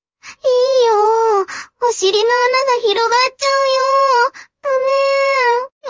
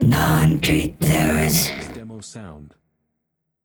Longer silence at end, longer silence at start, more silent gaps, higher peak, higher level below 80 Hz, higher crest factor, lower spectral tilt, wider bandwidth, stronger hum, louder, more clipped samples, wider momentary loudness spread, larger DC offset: second, 0 s vs 1 s; first, 0.25 s vs 0 s; first, 5.72-5.81 s vs none; about the same, -2 dBFS vs -4 dBFS; second, -66 dBFS vs -38 dBFS; about the same, 12 dB vs 16 dB; second, 0 dB/octave vs -5 dB/octave; second, 7.6 kHz vs over 20 kHz; neither; first, -14 LUFS vs -18 LUFS; neither; second, 7 LU vs 20 LU; neither